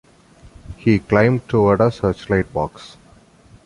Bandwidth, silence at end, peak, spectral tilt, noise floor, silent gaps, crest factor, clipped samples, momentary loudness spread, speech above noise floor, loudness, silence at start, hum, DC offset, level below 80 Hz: 11 kHz; 0.8 s; -2 dBFS; -8 dB/octave; -49 dBFS; none; 16 dB; under 0.1%; 9 LU; 32 dB; -18 LUFS; 0.7 s; none; under 0.1%; -40 dBFS